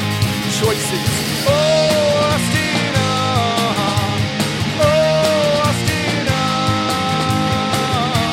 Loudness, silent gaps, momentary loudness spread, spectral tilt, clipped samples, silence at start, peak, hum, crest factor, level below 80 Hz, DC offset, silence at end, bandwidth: -16 LUFS; none; 4 LU; -4.5 dB/octave; under 0.1%; 0 s; 0 dBFS; none; 16 dB; -40 dBFS; under 0.1%; 0 s; 16.5 kHz